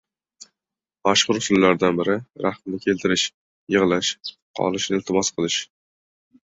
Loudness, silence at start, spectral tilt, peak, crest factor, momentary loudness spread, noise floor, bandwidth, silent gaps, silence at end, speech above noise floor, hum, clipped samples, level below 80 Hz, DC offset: -21 LUFS; 1.05 s; -3.5 dB/octave; -2 dBFS; 22 dB; 9 LU; -89 dBFS; 8 kHz; 3.34-3.67 s, 4.42-4.54 s; 0.85 s; 68 dB; none; under 0.1%; -58 dBFS; under 0.1%